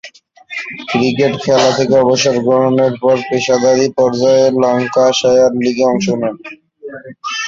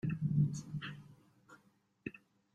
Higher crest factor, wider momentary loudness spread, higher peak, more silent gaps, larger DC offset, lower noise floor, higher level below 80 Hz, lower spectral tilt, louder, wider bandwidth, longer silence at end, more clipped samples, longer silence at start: second, 12 dB vs 18 dB; about the same, 16 LU vs 16 LU; first, 0 dBFS vs -22 dBFS; neither; neither; second, -38 dBFS vs -72 dBFS; first, -54 dBFS vs -70 dBFS; second, -4.5 dB/octave vs -7 dB/octave; first, -12 LUFS vs -39 LUFS; second, 7.6 kHz vs 8.8 kHz; second, 0 s vs 0.35 s; neither; about the same, 0.05 s vs 0.05 s